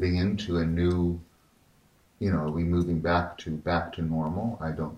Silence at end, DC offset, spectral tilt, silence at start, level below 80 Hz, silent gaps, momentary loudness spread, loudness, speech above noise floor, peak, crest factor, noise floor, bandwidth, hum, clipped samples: 0 s; under 0.1%; -8 dB/octave; 0 s; -48 dBFS; none; 7 LU; -28 LUFS; 35 dB; -12 dBFS; 16 dB; -62 dBFS; 9 kHz; none; under 0.1%